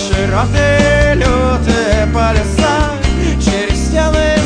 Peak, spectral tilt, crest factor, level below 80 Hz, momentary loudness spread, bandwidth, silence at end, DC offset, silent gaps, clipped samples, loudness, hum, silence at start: 0 dBFS; -5.5 dB/octave; 12 dB; -18 dBFS; 4 LU; 10.5 kHz; 0 s; under 0.1%; none; under 0.1%; -12 LUFS; none; 0 s